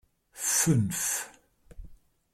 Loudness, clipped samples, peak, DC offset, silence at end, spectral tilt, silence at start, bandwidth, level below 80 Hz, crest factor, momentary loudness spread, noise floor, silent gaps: -27 LUFS; under 0.1%; -12 dBFS; under 0.1%; 0.4 s; -3.5 dB/octave; 0.35 s; 16.5 kHz; -54 dBFS; 20 dB; 10 LU; -56 dBFS; none